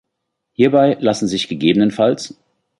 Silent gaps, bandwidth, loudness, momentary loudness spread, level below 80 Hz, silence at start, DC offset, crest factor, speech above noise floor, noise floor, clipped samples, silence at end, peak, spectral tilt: none; 11.5 kHz; -16 LUFS; 12 LU; -56 dBFS; 0.6 s; under 0.1%; 16 dB; 61 dB; -76 dBFS; under 0.1%; 0.5 s; -2 dBFS; -5.5 dB/octave